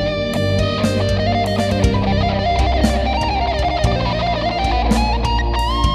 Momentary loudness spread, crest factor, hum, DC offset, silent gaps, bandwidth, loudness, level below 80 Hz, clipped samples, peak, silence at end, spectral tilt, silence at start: 2 LU; 16 dB; none; under 0.1%; none; 13 kHz; -18 LUFS; -22 dBFS; under 0.1%; 0 dBFS; 0 s; -6 dB/octave; 0 s